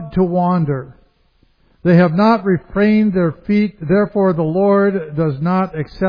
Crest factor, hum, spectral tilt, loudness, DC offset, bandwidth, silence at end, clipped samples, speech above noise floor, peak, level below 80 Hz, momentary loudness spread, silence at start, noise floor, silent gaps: 16 dB; none; -10.5 dB/octave; -15 LUFS; under 0.1%; 5.2 kHz; 0 s; under 0.1%; 42 dB; 0 dBFS; -44 dBFS; 7 LU; 0 s; -56 dBFS; none